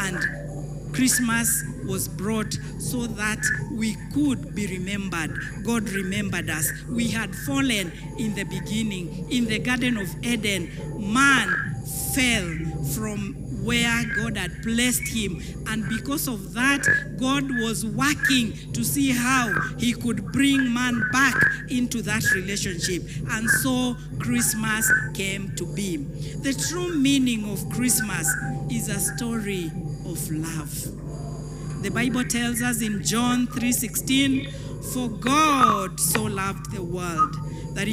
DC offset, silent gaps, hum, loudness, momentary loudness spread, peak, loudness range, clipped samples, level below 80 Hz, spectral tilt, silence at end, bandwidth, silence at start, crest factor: under 0.1%; none; none; -24 LUFS; 10 LU; -6 dBFS; 4 LU; under 0.1%; -42 dBFS; -3.5 dB/octave; 0 s; 16.5 kHz; 0 s; 18 dB